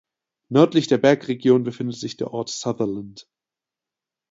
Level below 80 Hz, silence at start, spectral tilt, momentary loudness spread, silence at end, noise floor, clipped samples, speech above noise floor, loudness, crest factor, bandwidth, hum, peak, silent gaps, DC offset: -64 dBFS; 0.5 s; -6 dB/octave; 12 LU; 1.1 s; -89 dBFS; under 0.1%; 68 dB; -21 LUFS; 20 dB; 7.8 kHz; none; -2 dBFS; none; under 0.1%